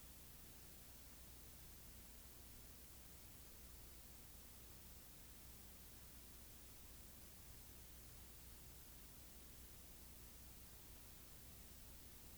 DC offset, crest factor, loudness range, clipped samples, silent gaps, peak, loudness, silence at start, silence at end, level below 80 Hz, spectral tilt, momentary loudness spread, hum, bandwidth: under 0.1%; 14 dB; 0 LU; under 0.1%; none; -44 dBFS; -57 LUFS; 0 s; 0 s; -66 dBFS; -3 dB/octave; 0 LU; 60 Hz at -65 dBFS; over 20 kHz